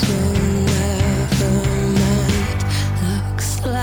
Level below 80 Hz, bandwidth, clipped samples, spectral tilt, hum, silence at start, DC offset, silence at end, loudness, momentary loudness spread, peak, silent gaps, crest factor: -28 dBFS; over 20 kHz; under 0.1%; -5.5 dB/octave; none; 0 s; under 0.1%; 0 s; -18 LUFS; 4 LU; -6 dBFS; none; 12 dB